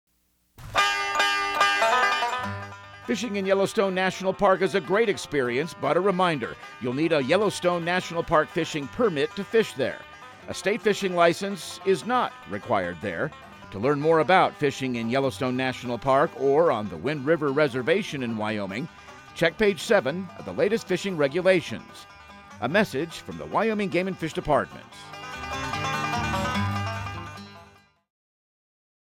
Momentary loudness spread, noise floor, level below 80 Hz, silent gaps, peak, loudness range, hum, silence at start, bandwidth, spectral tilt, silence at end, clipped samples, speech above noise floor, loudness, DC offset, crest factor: 14 LU; -66 dBFS; -54 dBFS; none; -6 dBFS; 4 LU; none; 0.6 s; 16.5 kHz; -5 dB/octave; 1.45 s; under 0.1%; 42 dB; -25 LUFS; under 0.1%; 20 dB